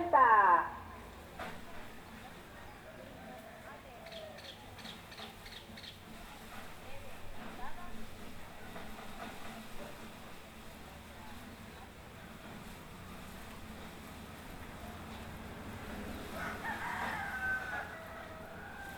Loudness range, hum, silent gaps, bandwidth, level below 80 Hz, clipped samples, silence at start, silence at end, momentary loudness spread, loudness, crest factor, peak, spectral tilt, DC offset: 9 LU; none; none; over 20 kHz; -56 dBFS; under 0.1%; 0 s; 0 s; 13 LU; -38 LUFS; 26 dB; -14 dBFS; -4.5 dB/octave; under 0.1%